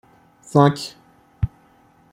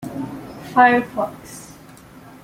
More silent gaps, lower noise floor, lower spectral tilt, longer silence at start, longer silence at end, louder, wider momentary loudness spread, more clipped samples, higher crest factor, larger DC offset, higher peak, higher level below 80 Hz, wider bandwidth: neither; first, -55 dBFS vs -43 dBFS; first, -7 dB/octave vs -5 dB/octave; first, 0.55 s vs 0 s; second, 0.65 s vs 0.8 s; about the same, -20 LUFS vs -18 LUFS; second, 14 LU vs 23 LU; neither; about the same, 20 dB vs 20 dB; neither; about the same, -2 dBFS vs -2 dBFS; first, -42 dBFS vs -56 dBFS; second, 14 kHz vs 16 kHz